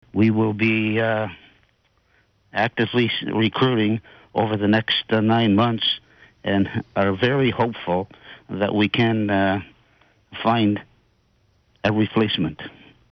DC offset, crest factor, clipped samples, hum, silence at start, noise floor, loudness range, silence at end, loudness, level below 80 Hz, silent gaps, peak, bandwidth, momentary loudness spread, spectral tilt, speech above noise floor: under 0.1%; 14 dB; under 0.1%; none; 0.15 s; -63 dBFS; 3 LU; 0.45 s; -21 LUFS; -58 dBFS; none; -8 dBFS; 6.2 kHz; 10 LU; -8 dB/octave; 43 dB